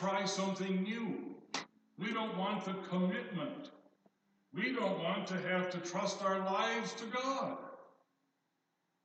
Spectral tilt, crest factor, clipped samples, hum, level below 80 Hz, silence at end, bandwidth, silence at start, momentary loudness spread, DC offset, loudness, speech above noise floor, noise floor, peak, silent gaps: -5 dB/octave; 18 dB; under 0.1%; none; under -90 dBFS; 1.15 s; 8.6 kHz; 0 s; 10 LU; under 0.1%; -37 LUFS; 46 dB; -83 dBFS; -20 dBFS; none